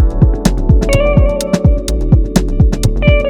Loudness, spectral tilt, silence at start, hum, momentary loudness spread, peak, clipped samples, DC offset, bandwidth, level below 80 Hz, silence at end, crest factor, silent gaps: -13 LUFS; -6.5 dB/octave; 0 s; none; 3 LU; 0 dBFS; under 0.1%; under 0.1%; 15 kHz; -14 dBFS; 0 s; 10 dB; none